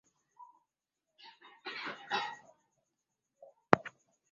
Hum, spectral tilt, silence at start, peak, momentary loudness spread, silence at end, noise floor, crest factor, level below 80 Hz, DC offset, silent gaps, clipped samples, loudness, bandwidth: none; -3 dB/octave; 0.4 s; -2 dBFS; 25 LU; 0.45 s; -88 dBFS; 38 dB; -74 dBFS; under 0.1%; none; under 0.1%; -35 LUFS; 7.4 kHz